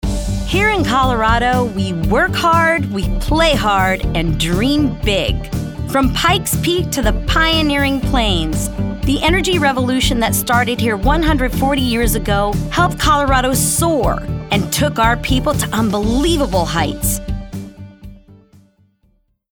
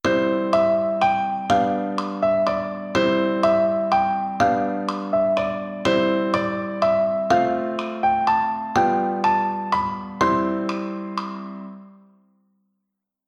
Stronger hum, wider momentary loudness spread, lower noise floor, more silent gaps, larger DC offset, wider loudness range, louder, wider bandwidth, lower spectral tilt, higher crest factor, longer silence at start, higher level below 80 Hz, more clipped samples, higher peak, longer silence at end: neither; about the same, 7 LU vs 7 LU; second, -59 dBFS vs -80 dBFS; neither; neither; about the same, 2 LU vs 3 LU; first, -15 LUFS vs -21 LUFS; first, over 20 kHz vs 9.4 kHz; second, -4.5 dB/octave vs -6 dB/octave; about the same, 14 dB vs 16 dB; about the same, 0.05 s vs 0.05 s; first, -24 dBFS vs -54 dBFS; neither; first, -2 dBFS vs -6 dBFS; second, 1.2 s vs 1.35 s